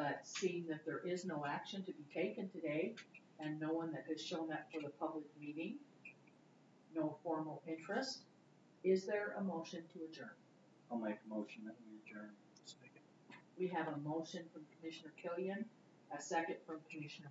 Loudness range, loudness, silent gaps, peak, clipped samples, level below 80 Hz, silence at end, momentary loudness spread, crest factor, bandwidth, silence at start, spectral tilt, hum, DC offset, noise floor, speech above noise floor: 5 LU; -45 LUFS; none; -24 dBFS; under 0.1%; under -90 dBFS; 0 s; 16 LU; 20 dB; 7.6 kHz; 0 s; -4.5 dB/octave; none; under 0.1%; -68 dBFS; 24 dB